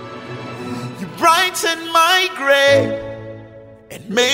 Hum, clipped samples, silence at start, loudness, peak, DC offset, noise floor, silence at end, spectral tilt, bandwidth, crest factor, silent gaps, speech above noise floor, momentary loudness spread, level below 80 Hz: none; under 0.1%; 0 s; -15 LUFS; 0 dBFS; under 0.1%; -40 dBFS; 0 s; -2.5 dB/octave; 16.5 kHz; 16 dB; none; 25 dB; 21 LU; -54 dBFS